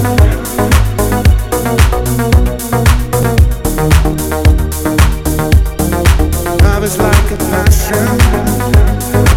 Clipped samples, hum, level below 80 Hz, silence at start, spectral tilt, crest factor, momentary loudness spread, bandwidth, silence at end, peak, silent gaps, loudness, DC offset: 1%; none; -12 dBFS; 0 s; -5.5 dB/octave; 10 dB; 3 LU; 17.5 kHz; 0 s; 0 dBFS; none; -11 LUFS; under 0.1%